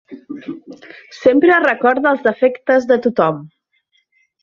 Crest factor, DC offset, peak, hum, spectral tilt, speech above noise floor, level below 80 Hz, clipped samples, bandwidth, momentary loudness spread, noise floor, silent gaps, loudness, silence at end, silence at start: 16 dB; under 0.1%; -2 dBFS; none; -6.5 dB/octave; 49 dB; -62 dBFS; under 0.1%; 7 kHz; 20 LU; -63 dBFS; none; -14 LUFS; 0.95 s; 0.1 s